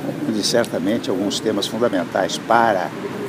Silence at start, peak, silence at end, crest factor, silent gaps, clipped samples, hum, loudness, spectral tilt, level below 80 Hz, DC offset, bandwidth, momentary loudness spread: 0 s; -2 dBFS; 0 s; 18 dB; none; under 0.1%; none; -20 LUFS; -4 dB/octave; -62 dBFS; under 0.1%; 15.5 kHz; 5 LU